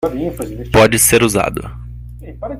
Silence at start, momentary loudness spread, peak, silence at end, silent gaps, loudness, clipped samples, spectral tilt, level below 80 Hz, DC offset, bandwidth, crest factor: 0 s; 24 LU; 0 dBFS; 0 s; none; -13 LUFS; under 0.1%; -4 dB/octave; -32 dBFS; under 0.1%; 16.5 kHz; 16 dB